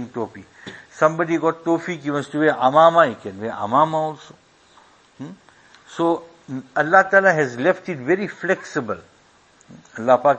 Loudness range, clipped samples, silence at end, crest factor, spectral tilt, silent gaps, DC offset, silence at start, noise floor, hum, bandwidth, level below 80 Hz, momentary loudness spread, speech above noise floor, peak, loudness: 6 LU; under 0.1%; 0 s; 20 dB; -6 dB/octave; none; under 0.1%; 0 s; -54 dBFS; none; 8.6 kHz; -66 dBFS; 24 LU; 35 dB; 0 dBFS; -19 LUFS